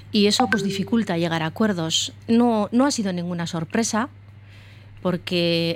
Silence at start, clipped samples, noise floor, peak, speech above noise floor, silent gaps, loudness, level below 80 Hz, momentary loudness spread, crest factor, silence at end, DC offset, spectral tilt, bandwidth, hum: 0 s; under 0.1%; -44 dBFS; -6 dBFS; 23 dB; none; -22 LUFS; -58 dBFS; 8 LU; 16 dB; 0 s; under 0.1%; -4.5 dB/octave; 16 kHz; none